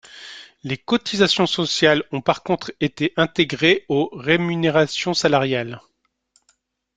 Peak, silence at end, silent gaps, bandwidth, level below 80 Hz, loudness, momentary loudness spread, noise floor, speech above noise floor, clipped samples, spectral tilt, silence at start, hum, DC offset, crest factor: -2 dBFS; 1.2 s; none; 9.4 kHz; -58 dBFS; -19 LUFS; 14 LU; -65 dBFS; 46 dB; under 0.1%; -4.5 dB/octave; 0.15 s; none; under 0.1%; 20 dB